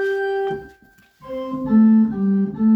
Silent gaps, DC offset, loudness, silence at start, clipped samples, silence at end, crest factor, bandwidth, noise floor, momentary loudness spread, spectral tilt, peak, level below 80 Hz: none; under 0.1%; -18 LUFS; 0 s; under 0.1%; 0 s; 12 dB; 5 kHz; -53 dBFS; 17 LU; -9.5 dB/octave; -6 dBFS; -54 dBFS